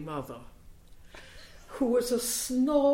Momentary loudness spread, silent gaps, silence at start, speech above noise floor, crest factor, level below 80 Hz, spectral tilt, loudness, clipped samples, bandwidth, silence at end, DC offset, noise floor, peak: 24 LU; none; 0 s; 23 dB; 16 dB; -54 dBFS; -4 dB/octave; -28 LUFS; under 0.1%; 16.5 kHz; 0 s; under 0.1%; -50 dBFS; -14 dBFS